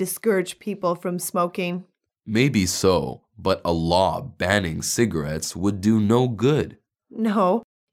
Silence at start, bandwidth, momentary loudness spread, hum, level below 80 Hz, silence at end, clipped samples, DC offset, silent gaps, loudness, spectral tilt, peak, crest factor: 0 s; 17 kHz; 8 LU; none; -48 dBFS; 0.3 s; under 0.1%; under 0.1%; none; -22 LUFS; -5 dB/octave; -4 dBFS; 18 dB